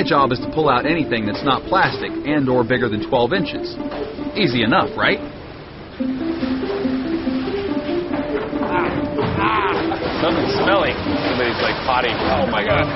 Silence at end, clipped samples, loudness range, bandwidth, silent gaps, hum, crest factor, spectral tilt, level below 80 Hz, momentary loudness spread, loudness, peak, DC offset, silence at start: 0 s; under 0.1%; 4 LU; 6 kHz; none; none; 18 dB; -3.5 dB/octave; -40 dBFS; 8 LU; -19 LUFS; -2 dBFS; under 0.1%; 0 s